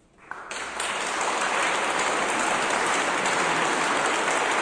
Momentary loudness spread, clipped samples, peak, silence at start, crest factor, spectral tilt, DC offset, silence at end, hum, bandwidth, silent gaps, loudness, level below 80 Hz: 9 LU; under 0.1%; -12 dBFS; 0.2 s; 14 dB; -1.5 dB/octave; under 0.1%; 0 s; none; 10.5 kHz; none; -24 LUFS; -62 dBFS